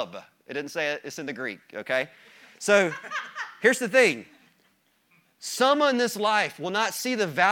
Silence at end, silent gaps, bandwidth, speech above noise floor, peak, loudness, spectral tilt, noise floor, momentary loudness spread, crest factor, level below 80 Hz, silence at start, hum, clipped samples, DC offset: 0 s; none; 18 kHz; 42 dB; -4 dBFS; -25 LUFS; -3 dB/octave; -67 dBFS; 16 LU; 22 dB; -80 dBFS; 0 s; none; under 0.1%; under 0.1%